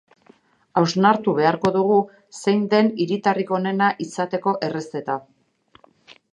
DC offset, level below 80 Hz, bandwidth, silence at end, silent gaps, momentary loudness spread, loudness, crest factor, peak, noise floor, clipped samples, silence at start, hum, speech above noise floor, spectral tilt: under 0.1%; -68 dBFS; 10.5 kHz; 0.2 s; none; 10 LU; -21 LUFS; 20 dB; -2 dBFS; -57 dBFS; under 0.1%; 0.75 s; none; 37 dB; -6 dB/octave